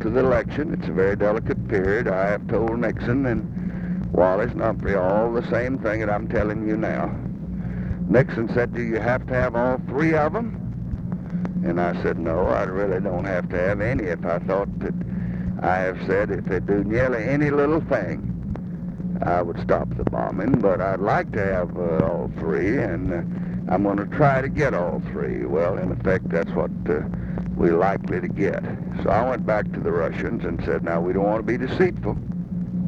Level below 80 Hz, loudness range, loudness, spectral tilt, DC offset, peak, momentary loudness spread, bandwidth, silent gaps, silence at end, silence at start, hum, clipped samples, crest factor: -38 dBFS; 2 LU; -23 LUFS; -9 dB/octave; under 0.1%; -2 dBFS; 8 LU; 7 kHz; none; 0 s; 0 s; none; under 0.1%; 20 dB